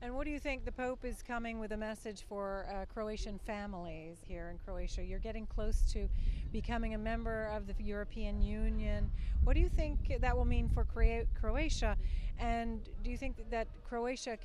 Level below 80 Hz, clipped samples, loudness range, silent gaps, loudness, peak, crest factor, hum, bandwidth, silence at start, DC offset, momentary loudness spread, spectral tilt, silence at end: -36 dBFS; under 0.1%; 7 LU; none; -39 LUFS; -16 dBFS; 18 dB; none; 11 kHz; 0 s; under 0.1%; 9 LU; -6 dB/octave; 0 s